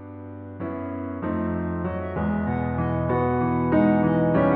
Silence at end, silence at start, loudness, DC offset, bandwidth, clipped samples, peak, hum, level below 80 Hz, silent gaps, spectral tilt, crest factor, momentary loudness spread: 0 s; 0 s; -24 LUFS; under 0.1%; 4.2 kHz; under 0.1%; -8 dBFS; none; -42 dBFS; none; -8.5 dB/octave; 16 dB; 13 LU